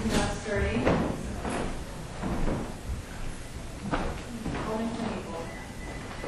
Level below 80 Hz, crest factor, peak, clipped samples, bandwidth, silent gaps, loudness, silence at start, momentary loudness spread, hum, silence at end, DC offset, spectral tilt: -38 dBFS; 24 dB; -8 dBFS; under 0.1%; 12.5 kHz; none; -33 LUFS; 0 s; 13 LU; none; 0 s; under 0.1%; -5.5 dB/octave